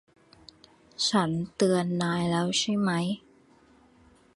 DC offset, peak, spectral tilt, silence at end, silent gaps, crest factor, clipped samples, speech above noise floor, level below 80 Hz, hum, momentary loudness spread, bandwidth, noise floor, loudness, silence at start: under 0.1%; -10 dBFS; -4.5 dB/octave; 1.15 s; none; 18 dB; under 0.1%; 33 dB; -64 dBFS; none; 7 LU; 11.5 kHz; -59 dBFS; -27 LUFS; 1 s